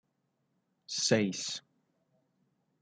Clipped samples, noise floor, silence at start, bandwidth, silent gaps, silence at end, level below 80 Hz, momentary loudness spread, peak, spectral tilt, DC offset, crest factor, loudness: under 0.1%; -79 dBFS; 0.9 s; 9.6 kHz; none; 1.2 s; -82 dBFS; 11 LU; -12 dBFS; -3.5 dB/octave; under 0.1%; 24 dB; -31 LUFS